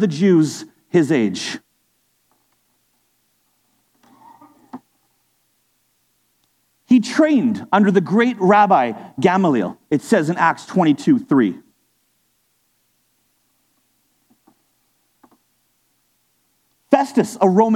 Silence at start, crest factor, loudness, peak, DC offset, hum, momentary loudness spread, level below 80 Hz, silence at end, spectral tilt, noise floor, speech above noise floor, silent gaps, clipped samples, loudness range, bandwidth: 0 s; 20 dB; -17 LUFS; 0 dBFS; under 0.1%; none; 12 LU; -70 dBFS; 0 s; -6.5 dB/octave; -65 dBFS; 50 dB; none; under 0.1%; 10 LU; 14 kHz